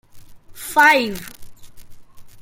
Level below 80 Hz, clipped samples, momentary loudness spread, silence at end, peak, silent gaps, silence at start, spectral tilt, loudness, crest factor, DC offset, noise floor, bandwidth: -48 dBFS; under 0.1%; 22 LU; 0 s; -2 dBFS; none; 0.15 s; -2.5 dB/octave; -15 LUFS; 20 dB; under 0.1%; -39 dBFS; 17 kHz